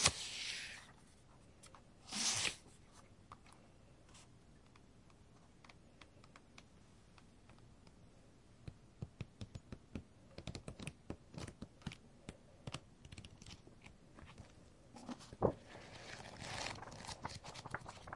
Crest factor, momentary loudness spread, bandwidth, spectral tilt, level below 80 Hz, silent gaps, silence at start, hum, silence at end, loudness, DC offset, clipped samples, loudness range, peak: 34 dB; 25 LU; 11.5 kHz; -2.5 dB/octave; -66 dBFS; none; 0 s; none; 0 s; -46 LUFS; under 0.1%; under 0.1%; 19 LU; -14 dBFS